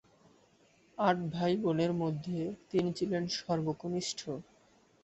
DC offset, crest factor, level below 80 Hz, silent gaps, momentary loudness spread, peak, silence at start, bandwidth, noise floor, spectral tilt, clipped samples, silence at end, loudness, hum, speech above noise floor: under 0.1%; 20 dB; -68 dBFS; none; 8 LU; -14 dBFS; 1 s; 8.2 kHz; -66 dBFS; -5.5 dB/octave; under 0.1%; 0.6 s; -34 LUFS; none; 33 dB